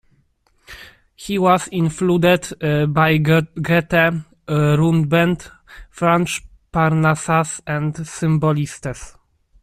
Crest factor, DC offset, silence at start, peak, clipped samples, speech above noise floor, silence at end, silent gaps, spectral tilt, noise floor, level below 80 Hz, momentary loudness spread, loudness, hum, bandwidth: 16 dB; under 0.1%; 0.7 s; -2 dBFS; under 0.1%; 44 dB; 0.55 s; none; -6 dB/octave; -61 dBFS; -46 dBFS; 12 LU; -18 LUFS; none; 14.5 kHz